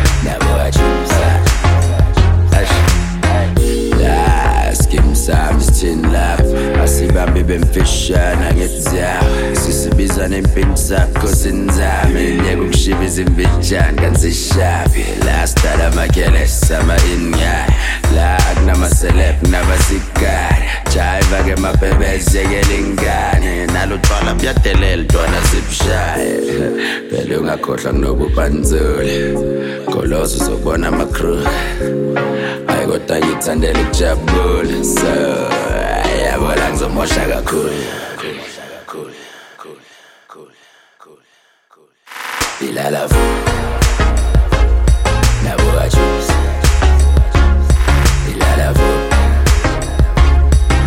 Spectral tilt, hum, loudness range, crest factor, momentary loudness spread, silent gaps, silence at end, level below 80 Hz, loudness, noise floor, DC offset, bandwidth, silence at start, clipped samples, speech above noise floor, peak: -5 dB/octave; none; 4 LU; 12 dB; 5 LU; none; 0 s; -16 dBFS; -14 LUFS; -54 dBFS; under 0.1%; 16.5 kHz; 0 s; under 0.1%; 40 dB; 0 dBFS